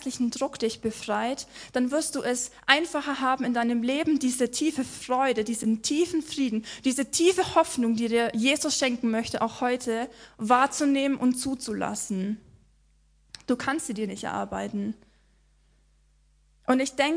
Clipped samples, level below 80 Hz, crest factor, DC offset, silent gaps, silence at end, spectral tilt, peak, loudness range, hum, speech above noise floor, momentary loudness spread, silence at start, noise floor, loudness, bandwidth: under 0.1%; -60 dBFS; 26 dB; under 0.1%; none; 0 s; -3 dB/octave; -2 dBFS; 8 LU; none; 36 dB; 9 LU; 0 s; -63 dBFS; -26 LUFS; 10.5 kHz